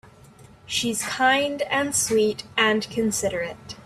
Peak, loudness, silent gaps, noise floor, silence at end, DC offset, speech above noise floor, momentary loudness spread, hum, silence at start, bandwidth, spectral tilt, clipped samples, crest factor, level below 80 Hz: -6 dBFS; -23 LUFS; none; -49 dBFS; 0 s; under 0.1%; 26 dB; 7 LU; none; 0.4 s; 15.5 kHz; -2.5 dB/octave; under 0.1%; 20 dB; -56 dBFS